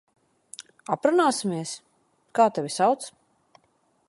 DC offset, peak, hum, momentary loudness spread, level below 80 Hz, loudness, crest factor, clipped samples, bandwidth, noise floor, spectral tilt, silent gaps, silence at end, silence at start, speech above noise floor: under 0.1%; -6 dBFS; none; 20 LU; -78 dBFS; -24 LUFS; 20 dB; under 0.1%; 11.5 kHz; -67 dBFS; -4.5 dB/octave; none; 1 s; 0.9 s; 44 dB